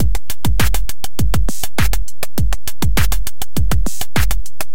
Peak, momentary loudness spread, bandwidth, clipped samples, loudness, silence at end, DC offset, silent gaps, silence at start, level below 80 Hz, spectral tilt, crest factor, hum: 0 dBFS; 6 LU; 17.5 kHz; under 0.1%; -21 LUFS; 0.1 s; 30%; none; 0 s; -20 dBFS; -4 dB/octave; 14 dB; none